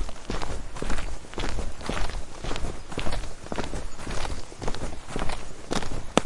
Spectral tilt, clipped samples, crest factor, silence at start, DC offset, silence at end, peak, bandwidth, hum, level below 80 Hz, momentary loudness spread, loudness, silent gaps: -4.5 dB/octave; under 0.1%; 24 dB; 0 s; under 0.1%; 0 s; 0 dBFS; 11.5 kHz; none; -34 dBFS; 4 LU; -34 LUFS; none